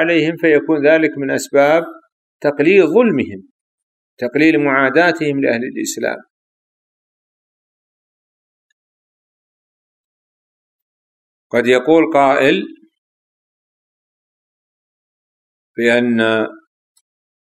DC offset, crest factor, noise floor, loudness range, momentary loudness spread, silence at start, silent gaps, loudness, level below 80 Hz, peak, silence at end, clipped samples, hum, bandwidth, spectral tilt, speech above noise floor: under 0.1%; 18 dB; under -90 dBFS; 9 LU; 10 LU; 0 s; 2.12-2.40 s, 3.51-4.17 s, 6.30-11.50 s, 12.98-15.75 s; -14 LUFS; -64 dBFS; 0 dBFS; 0.9 s; under 0.1%; none; 14 kHz; -5 dB/octave; over 76 dB